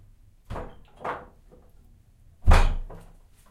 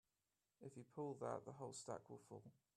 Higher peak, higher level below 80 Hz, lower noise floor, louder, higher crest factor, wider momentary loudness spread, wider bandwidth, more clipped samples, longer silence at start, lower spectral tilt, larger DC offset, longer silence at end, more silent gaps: first, -4 dBFS vs -32 dBFS; first, -28 dBFS vs -90 dBFS; second, -55 dBFS vs under -90 dBFS; first, -28 LUFS vs -54 LUFS; about the same, 22 dB vs 22 dB; first, 23 LU vs 12 LU; second, 11.5 kHz vs 13 kHz; neither; about the same, 0.5 s vs 0.6 s; about the same, -5.5 dB/octave vs -5.5 dB/octave; neither; first, 0.55 s vs 0.25 s; neither